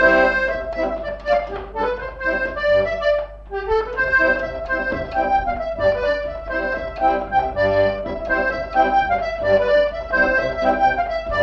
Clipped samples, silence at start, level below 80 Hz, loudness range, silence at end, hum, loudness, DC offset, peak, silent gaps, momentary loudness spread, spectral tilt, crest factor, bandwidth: under 0.1%; 0 s; -36 dBFS; 3 LU; 0 s; 50 Hz at -40 dBFS; -20 LUFS; under 0.1%; -2 dBFS; none; 8 LU; -6 dB/octave; 18 dB; 7.2 kHz